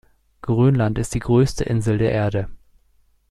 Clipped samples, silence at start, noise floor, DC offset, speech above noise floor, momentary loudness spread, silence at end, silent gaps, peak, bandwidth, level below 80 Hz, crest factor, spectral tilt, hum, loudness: under 0.1%; 0.45 s; -59 dBFS; under 0.1%; 41 dB; 9 LU; 0.75 s; none; -4 dBFS; 12.5 kHz; -38 dBFS; 16 dB; -7.5 dB/octave; none; -20 LUFS